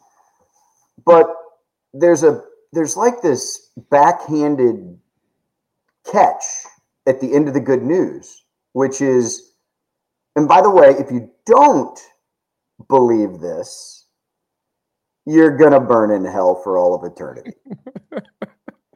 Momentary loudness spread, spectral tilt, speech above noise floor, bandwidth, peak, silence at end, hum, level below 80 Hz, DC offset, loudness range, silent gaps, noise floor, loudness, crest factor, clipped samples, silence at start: 22 LU; -5.5 dB/octave; 64 dB; 12 kHz; 0 dBFS; 0.5 s; none; -68 dBFS; under 0.1%; 6 LU; none; -79 dBFS; -15 LUFS; 16 dB; under 0.1%; 1.05 s